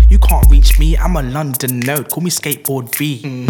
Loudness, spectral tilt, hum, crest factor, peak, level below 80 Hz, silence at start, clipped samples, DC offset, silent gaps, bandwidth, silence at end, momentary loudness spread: -14 LUFS; -5 dB/octave; none; 10 dB; 0 dBFS; -12 dBFS; 0 s; under 0.1%; under 0.1%; none; 19 kHz; 0 s; 9 LU